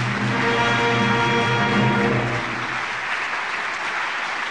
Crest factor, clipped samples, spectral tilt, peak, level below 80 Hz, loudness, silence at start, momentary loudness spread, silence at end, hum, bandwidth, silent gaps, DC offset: 14 dB; under 0.1%; -5 dB/octave; -6 dBFS; -50 dBFS; -21 LUFS; 0 s; 6 LU; 0 s; none; 10.5 kHz; none; 0.3%